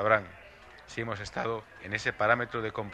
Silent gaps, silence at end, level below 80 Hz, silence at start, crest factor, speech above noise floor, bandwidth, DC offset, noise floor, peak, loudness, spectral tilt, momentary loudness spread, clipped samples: none; 0 s; -58 dBFS; 0 s; 24 dB; 21 dB; 11.5 kHz; under 0.1%; -52 dBFS; -8 dBFS; -31 LUFS; -5 dB/octave; 22 LU; under 0.1%